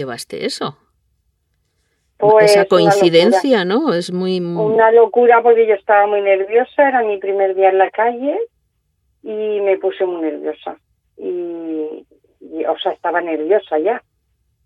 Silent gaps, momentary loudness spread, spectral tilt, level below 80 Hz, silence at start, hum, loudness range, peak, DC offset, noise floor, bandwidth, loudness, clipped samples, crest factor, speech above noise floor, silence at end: none; 15 LU; -5 dB/octave; -66 dBFS; 0 s; none; 10 LU; 0 dBFS; under 0.1%; -66 dBFS; 13 kHz; -15 LUFS; under 0.1%; 16 dB; 52 dB; 0.65 s